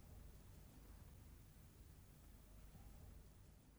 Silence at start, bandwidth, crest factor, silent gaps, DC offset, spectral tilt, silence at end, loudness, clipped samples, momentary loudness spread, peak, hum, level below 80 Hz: 0 s; over 20 kHz; 12 dB; none; under 0.1%; -5.5 dB/octave; 0 s; -64 LUFS; under 0.1%; 3 LU; -50 dBFS; 50 Hz at -65 dBFS; -64 dBFS